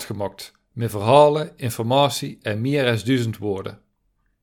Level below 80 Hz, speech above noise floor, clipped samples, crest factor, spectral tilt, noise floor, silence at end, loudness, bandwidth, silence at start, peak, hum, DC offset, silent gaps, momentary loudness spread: -60 dBFS; 48 dB; under 0.1%; 22 dB; -5.5 dB/octave; -68 dBFS; 0.7 s; -21 LUFS; 19 kHz; 0 s; 0 dBFS; none; under 0.1%; none; 16 LU